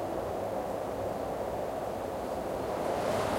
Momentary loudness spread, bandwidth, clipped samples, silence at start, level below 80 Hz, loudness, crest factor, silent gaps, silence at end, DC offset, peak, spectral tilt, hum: 4 LU; 16.5 kHz; under 0.1%; 0 s; -54 dBFS; -34 LUFS; 14 dB; none; 0 s; under 0.1%; -18 dBFS; -5.5 dB/octave; none